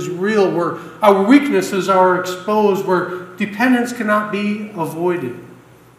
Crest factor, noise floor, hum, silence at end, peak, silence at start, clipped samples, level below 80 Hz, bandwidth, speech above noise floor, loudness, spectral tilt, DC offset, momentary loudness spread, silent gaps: 16 dB; -43 dBFS; none; 0.45 s; 0 dBFS; 0 s; under 0.1%; -64 dBFS; 15.5 kHz; 27 dB; -16 LUFS; -5.5 dB/octave; under 0.1%; 12 LU; none